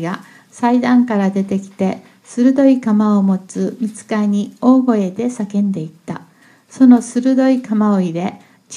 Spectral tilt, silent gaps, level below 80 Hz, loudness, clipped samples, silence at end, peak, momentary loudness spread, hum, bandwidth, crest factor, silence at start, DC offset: -7 dB/octave; none; -66 dBFS; -15 LUFS; under 0.1%; 0 s; 0 dBFS; 13 LU; none; 11 kHz; 16 dB; 0 s; under 0.1%